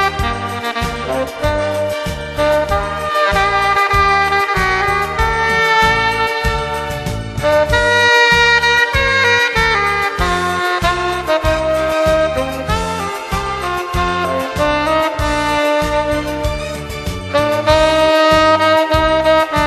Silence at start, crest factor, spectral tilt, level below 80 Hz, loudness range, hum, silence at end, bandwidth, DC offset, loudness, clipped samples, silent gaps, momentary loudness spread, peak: 0 s; 14 dB; -4 dB/octave; -28 dBFS; 5 LU; none; 0 s; 13 kHz; under 0.1%; -14 LUFS; under 0.1%; none; 10 LU; 0 dBFS